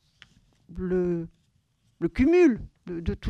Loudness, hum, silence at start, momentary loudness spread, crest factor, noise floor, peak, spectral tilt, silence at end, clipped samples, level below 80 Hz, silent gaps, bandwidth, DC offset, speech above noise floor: -25 LUFS; none; 0.7 s; 18 LU; 16 dB; -68 dBFS; -10 dBFS; -8 dB/octave; 0 s; under 0.1%; -44 dBFS; none; 7.6 kHz; under 0.1%; 45 dB